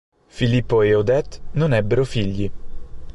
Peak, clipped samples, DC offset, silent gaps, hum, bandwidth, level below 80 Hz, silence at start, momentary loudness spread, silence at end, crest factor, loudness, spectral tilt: -6 dBFS; under 0.1%; under 0.1%; none; none; 11 kHz; -38 dBFS; 0.35 s; 10 LU; 0.05 s; 14 dB; -20 LUFS; -7.5 dB/octave